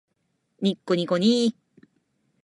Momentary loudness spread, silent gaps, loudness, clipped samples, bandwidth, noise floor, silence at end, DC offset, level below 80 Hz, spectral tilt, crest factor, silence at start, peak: 7 LU; none; -24 LUFS; under 0.1%; 11.5 kHz; -74 dBFS; 0.95 s; under 0.1%; -76 dBFS; -6 dB/octave; 16 dB; 0.6 s; -10 dBFS